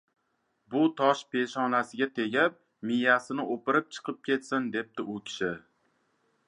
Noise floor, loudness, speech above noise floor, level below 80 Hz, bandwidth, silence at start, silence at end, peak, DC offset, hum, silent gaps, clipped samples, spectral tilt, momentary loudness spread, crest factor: -76 dBFS; -29 LUFS; 47 dB; -76 dBFS; 11 kHz; 0.7 s; 0.9 s; -8 dBFS; under 0.1%; none; none; under 0.1%; -5 dB/octave; 12 LU; 22 dB